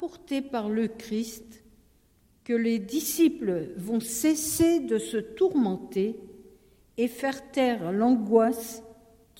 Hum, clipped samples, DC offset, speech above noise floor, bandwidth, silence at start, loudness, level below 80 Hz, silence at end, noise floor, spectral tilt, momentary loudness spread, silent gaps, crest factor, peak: none; under 0.1%; under 0.1%; 37 dB; 17 kHz; 0 s; -27 LUFS; -60 dBFS; 0.45 s; -63 dBFS; -4.5 dB/octave; 11 LU; none; 20 dB; -8 dBFS